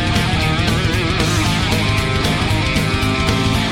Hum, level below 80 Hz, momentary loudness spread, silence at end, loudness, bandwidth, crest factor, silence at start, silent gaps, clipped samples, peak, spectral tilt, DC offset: none; -26 dBFS; 1 LU; 0 s; -16 LUFS; 16.5 kHz; 10 dB; 0 s; none; under 0.1%; -6 dBFS; -4.5 dB/octave; under 0.1%